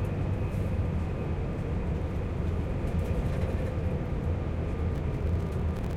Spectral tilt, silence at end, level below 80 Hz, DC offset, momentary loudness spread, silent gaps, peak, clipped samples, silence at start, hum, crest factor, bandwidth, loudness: -8.5 dB/octave; 0 s; -34 dBFS; under 0.1%; 2 LU; none; -18 dBFS; under 0.1%; 0 s; none; 12 dB; 10 kHz; -31 LUFS